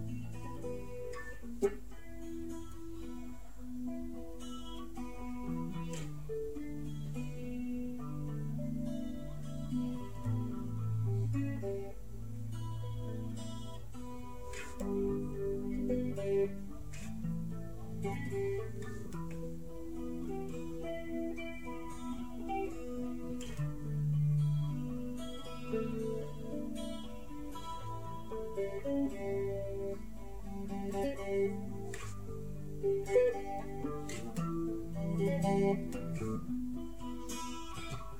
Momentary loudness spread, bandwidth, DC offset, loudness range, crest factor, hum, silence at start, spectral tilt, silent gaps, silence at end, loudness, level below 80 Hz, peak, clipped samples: 12 LU; 16 kHz; 0.7%; 7 LU; 20 dB; none; 0 s; -7 dB/octave; none; 0 s; -39 LUFS; -52 dBFS; -18 dBFS; under 0.1%